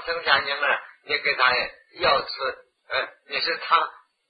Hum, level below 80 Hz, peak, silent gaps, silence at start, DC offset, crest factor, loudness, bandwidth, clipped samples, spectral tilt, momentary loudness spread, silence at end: none; -60 dBFS; -4 dBFS; none; 0 s; under 0.1%; 20 dB; -23 LUFS; 5.2 kHz; under 0.1%; -5 dB/octave; 10 LU; 0.4 s